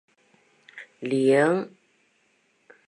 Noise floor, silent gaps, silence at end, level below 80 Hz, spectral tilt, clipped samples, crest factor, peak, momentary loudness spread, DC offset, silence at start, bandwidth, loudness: -67 dBFS; none; 1.2 s; -82 dBFS; -6.5 dB/octave; under 0.1%; 20 dB; -8 dBFS; 25 LU; under 0.1%; 0.75 s; 11 kHz; -23 LUFS